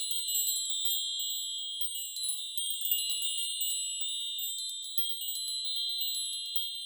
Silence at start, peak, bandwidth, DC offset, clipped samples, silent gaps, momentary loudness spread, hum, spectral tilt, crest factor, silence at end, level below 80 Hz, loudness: 0 s; -14 dBFS; over 20 kHz; under 0.1%; under 0.1%; none; 4 LU; none; 11 dB/octave; 20 dB; 0 s; under -90 dBFS; -30 LUFS